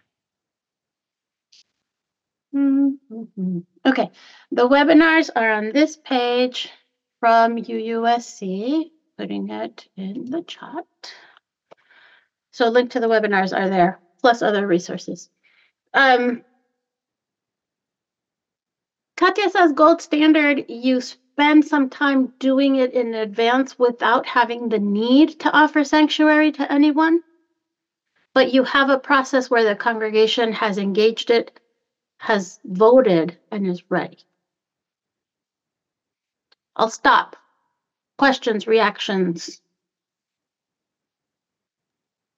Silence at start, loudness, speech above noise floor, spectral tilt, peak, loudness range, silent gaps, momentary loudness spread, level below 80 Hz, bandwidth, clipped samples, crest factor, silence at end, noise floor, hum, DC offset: 2.55 s; -18 LUFS; 69 dB; -5 dB/octave; -4 dBFS; 9 LU; none; 15 LU; -68 dBFS; 7.8 kHz; under 0.1%; 16 dB; 2.8 s; -87 dBFS; none; under 0.1%